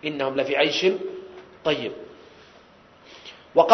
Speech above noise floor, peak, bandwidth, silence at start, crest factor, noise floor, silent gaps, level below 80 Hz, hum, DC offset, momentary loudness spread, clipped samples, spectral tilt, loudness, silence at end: 28 dB; 0 dBFS; 6.4 kHz; 0 s; 24 dB; -52 dBFS; none; -66 dBFS; none; under 0.1%; 22 LU; under 0.1%; -4 dB/octave; -24 LUFS; 0 s